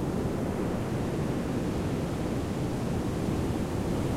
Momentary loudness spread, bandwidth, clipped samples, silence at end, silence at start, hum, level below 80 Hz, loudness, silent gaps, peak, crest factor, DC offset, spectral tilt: 1 LU; 16.5 kHz; under 0.1%; 0 s; 0 s; none; -42 dBFS; -31 LUFS; none; -16 dBFS; 14 dB; under 0.1%; -7 dB/octave